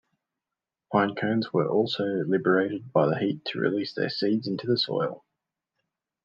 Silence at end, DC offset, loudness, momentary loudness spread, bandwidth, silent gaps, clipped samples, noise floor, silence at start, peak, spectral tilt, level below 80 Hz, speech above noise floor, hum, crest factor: 1.05 s; under 0.1%; -26 LUFS; 5 LU; 7.2 kHz; none; under 0.1%; -89 dBFS; 0.9 s; -8 dBFS; -7.5 dB/octave; -76 dBFS; 63 dB; none; 20 dB